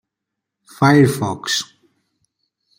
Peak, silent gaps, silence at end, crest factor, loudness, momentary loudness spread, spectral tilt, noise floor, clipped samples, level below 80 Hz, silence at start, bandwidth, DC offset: 0 dBFS; none; 1.15 s; 18 dB; -16 LUFS; 10 LU; -5 dB/octave; -81 dBFS; under 0.1%; -58 dBFS; 0.8 s; 16 kHz; under 0.1%